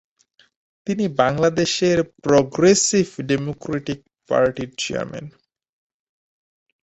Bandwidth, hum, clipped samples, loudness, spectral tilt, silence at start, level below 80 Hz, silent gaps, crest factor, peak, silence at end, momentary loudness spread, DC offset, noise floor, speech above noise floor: 8.2 kHz; none; under 0.1%; -20 LUFS; -4.5 dB/octave; 0.85 s; -54 dBFS; none; 20 dB; -2 dBFS; 1.55 s; 14 LU; under 0.1%; -60 dBFS; 40 dB